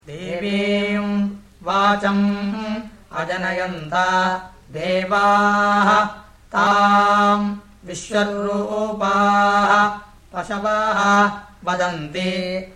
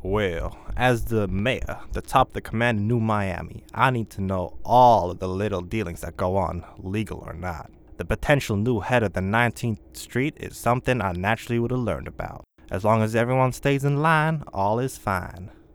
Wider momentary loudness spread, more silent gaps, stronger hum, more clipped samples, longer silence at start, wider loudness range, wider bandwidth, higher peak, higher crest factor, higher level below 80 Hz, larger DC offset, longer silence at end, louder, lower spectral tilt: about the same, 14 LU vs 12 LU; neither; neither; neither; about the same, 0.05 s vs 0 s; about the same, 4 LU vs 4 LU; second, 11 kHz vs 18 kHz; about the same, -4 dBFS vs -2 dBFS; about the same, 16 dB vs 20 dB; second, -50 dBFS vs -40 dBFS; neither; second, 0.05 s vs 0.2 s; first, -19 LUFS vs -24 LUFS; second, -5 dB/octave vs -6.5 dB/octave